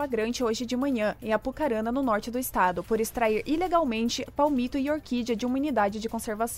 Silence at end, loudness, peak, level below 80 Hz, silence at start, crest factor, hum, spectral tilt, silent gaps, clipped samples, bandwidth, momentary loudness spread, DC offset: 0 s; -27 LUFS; -10 dBFS; -50 dBFS; 0 s; 16 dB; none; -4.5 dB/octave; none; under 0.1%; 16 kHz; 4 LU; under 0.1%